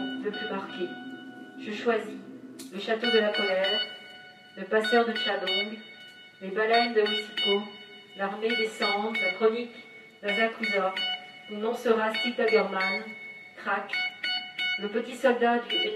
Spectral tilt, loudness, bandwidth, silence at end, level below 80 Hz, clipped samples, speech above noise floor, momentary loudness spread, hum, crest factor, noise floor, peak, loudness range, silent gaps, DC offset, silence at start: -4 dB/octave; -27 LUFS; 13.5 kHz; 0 s; -86 dBFS; under 0.1%; 21 dB; 18 LU; none; 20 dB; -49 dBFS; -10 dBFS; 2 LU; none; under 0.1%; 0 s